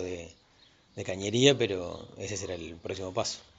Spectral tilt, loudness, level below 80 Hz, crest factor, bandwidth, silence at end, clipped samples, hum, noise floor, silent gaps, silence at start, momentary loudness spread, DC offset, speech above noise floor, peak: -4 dB/octave; -30 LUFS; -62 dBFS; 26 dB; 9.2 kHz; 0.15 s; under 0.1%; none; -62 dBFS; none; 0 s; 18 LU; under 0.1%; 31 dB; -6 dBFS